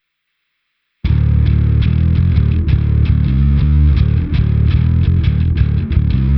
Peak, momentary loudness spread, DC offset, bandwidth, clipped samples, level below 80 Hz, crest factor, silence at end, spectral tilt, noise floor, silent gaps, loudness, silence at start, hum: 0 dBFS; 3 LU; under 0.1%; 5.2 kHz; under 0.1%; -16 dBFS; 12 dB; 0 s; -11 dB/octave; -71 dBFS; none; -14 LUFS; 1.05 s; none